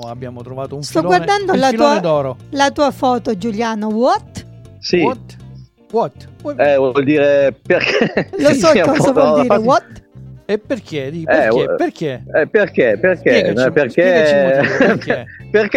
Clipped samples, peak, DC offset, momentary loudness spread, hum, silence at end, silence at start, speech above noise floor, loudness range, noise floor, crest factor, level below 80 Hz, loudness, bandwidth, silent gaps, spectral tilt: under 0.1%; 0 dBFS; under 0.1%; 12 LU; none; 0 s; 0 s; 23 dB; 5 LU; -37 dBFS; 14 dB; -48 dBFS; -14 LUFS; 13 kHz; none; -5.5 dB/octave